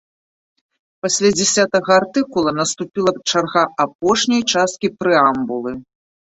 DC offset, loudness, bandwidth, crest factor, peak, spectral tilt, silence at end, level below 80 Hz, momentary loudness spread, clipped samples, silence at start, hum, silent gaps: under 0.1%; -17 LUFS; 8.2 kHz; 16 dB; -2 dBFS; -3 dB/octave; 0.5 s; -56 dBFS; 8 LU; under 0.1%; 1.05 s; none; 3.95-3.99 s